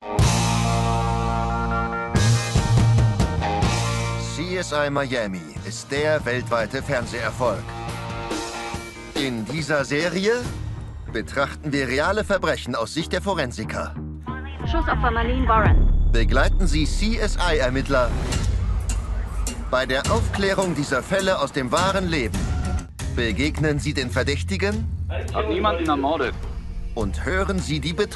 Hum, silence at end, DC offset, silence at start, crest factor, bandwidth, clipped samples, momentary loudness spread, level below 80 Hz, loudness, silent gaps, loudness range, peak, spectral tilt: none; 0 s; under 0.1%; 0 s; 16 dB; 12.5 kHz; under 0.1%; 10 LU; -28 dBFS; -23 LUFS; none; 4 LU; -6 dBFS; -5 dB/octave